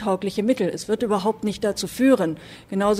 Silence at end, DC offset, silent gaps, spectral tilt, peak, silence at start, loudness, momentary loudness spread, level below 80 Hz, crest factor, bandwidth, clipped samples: 0 s; under 0.1%; none; -5.5 dB/octave; -6 dBFS; 0 s; -23 LUFS; 8 LU; -54 dBFS; 16 dB; 15.5 kHz; under 0.1%